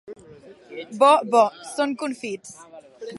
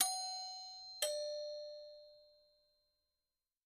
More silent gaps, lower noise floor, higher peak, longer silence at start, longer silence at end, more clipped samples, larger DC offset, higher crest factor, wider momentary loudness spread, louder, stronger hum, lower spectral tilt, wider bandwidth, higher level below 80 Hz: neither; second, -47 dBFS vs under -90 dBFS; first, -4 dBFS vs -18 dBFS; about the same, 0.1 s vs 0 s; second, 0 s vs 1.3 s; neither; neither; second, 20 dB vs 28 dB; first, 22 LU vs 18 LU; first, -21 LUFS vs -42 LUFS; neither; first, -3.5 dB/octave vs 3 dB/octave; second, 11.5 kHz vs 15 kHz; first, -72 dBFS vs -86 dBFS